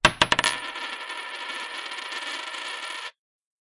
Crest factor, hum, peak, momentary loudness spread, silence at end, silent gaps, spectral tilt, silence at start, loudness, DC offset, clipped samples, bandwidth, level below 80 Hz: 24 dB; none; -6 dBFS; 12 LU; 0.6 s; none; -1.5 dB/octave; 0.05 s; -27 LUFS; under 0.1%; under 0.1%; 11.5 kHz; -52 dBFS